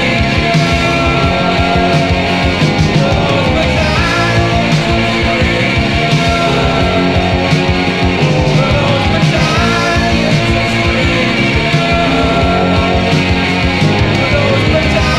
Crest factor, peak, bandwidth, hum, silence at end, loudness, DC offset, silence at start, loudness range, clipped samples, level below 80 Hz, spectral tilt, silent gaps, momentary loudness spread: 10 dB; 0 dBFS; 13 kHz; none; 0 s; -11 LUFS; under 0.1%; 0 s; 0 LU; under 0.1%; -22 dBFS; -5.5 dB/octave; none; 1 LU